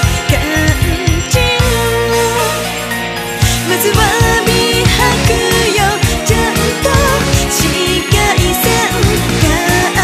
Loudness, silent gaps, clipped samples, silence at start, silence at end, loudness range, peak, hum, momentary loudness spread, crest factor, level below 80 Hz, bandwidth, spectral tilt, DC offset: -11 LUFS; none; under 0.1%; 0 s; 0 s; 2 LU; 0 dBFS; none; 3 LU; 12 dB; -22 dBFS; 15.5 kHz; -4 dB/octave; under 0.1%